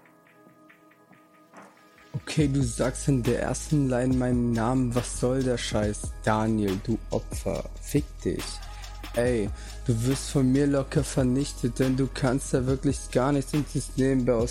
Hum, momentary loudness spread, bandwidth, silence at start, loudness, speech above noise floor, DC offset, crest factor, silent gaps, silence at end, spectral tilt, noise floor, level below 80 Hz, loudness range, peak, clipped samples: none; 8 LU; 16 kHz; 1.55 s; -27 LUFS; 30 dB; under 0.1%; 18 dB; none; 0 s; -6 dB/octave; -56 dBFS; -40 dBFS; 4 LU; -10 dBFS; under 0.1%